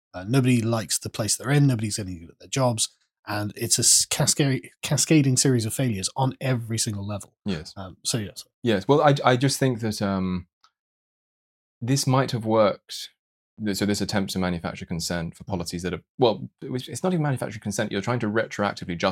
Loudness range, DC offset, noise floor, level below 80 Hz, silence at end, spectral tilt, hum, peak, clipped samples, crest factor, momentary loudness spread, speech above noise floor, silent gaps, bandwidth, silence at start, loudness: 6 LU; under 0.1%; under -90 dBFS; -60 dBFS; 0 s; -4.5 dB/octave; none; -2 dBFS; under 0.1%; 22 dB; 13 LU; over 66 dB; 3.19-3.23 s, 8.54-8.62 s, 10.53-10.61 s, 10.79-11.81 s, 13.19-13.57 s, 16.09-16.18 s; 16.5 kHz; 0.15 s; -24 LUFS